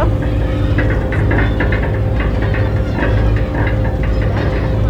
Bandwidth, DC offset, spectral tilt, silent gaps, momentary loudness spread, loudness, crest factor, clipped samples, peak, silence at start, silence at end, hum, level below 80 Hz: 6.2 kHz; under 0.1%; -8.5 dB/octave; none; 2 LU; -16 LUFS; 14 dB; under 0.1%; 0 dBFS; 0 s; 0 s; none; -18 dBFS